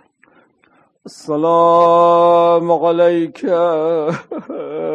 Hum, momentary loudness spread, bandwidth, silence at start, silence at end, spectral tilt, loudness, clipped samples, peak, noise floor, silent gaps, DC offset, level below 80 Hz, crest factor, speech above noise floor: none; 16 LU; 8.8 kHz; 1.05 s; 0 s; -7 dB/octave; -13 LUFS; under 0.1%; 0 dBFS; -55 dBFS; none; under 0.1%; -66 dBFS; 14 dB; 42 dB